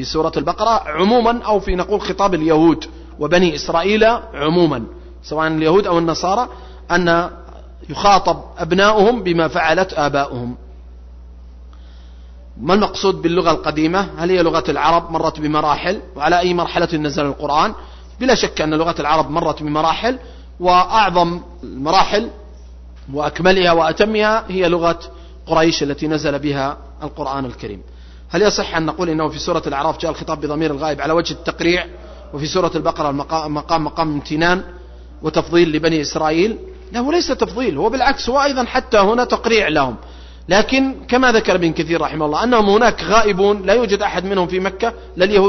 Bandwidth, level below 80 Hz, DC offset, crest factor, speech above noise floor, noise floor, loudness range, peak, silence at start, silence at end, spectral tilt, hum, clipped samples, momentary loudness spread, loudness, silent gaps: 6.4 kHz; -36 dBFS; under 0.1%; 16 dB; 21 dB; -37 dBFS; 4 LU; 0 dBFS; 0 s; 0 s; -5 dB/octave; none; under 0.1%; 11 LU; -16 LUFS; none